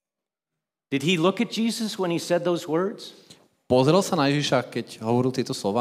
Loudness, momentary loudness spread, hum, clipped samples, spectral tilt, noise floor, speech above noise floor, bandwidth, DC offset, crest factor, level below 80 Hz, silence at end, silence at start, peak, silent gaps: -24 LUFS; 10 LU; none; under 0.1%; -5.5 dB/octave; -89 dBFS; 66 dB; 16 kHz; under 0.1%; 18 dB; -68 dBFS; 0 s; 0.9 s; -6 dBFS; none